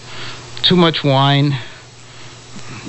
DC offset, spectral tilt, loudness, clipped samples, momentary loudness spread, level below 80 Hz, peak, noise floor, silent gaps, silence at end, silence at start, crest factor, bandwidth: under 0.1%; -6 dB/octave; -14 LUFS; under 0.1%; 23 LU; -46 dBFS; 0 dBFS; -37 dBFS; none; 0 s; 0 s; 16 dB; 8.4 kHz